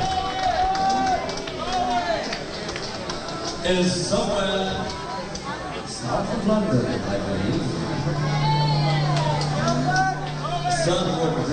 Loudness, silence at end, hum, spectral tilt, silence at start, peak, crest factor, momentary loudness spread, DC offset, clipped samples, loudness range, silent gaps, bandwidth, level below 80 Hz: -24 LUFS; 0 s; none; -5 dB/octave; 0 s; -8 dBFS; 16 dB; 8 LU; under 0.1%; under 0.1%; 3 LU; none; 9.8 kHz; -42 dBFS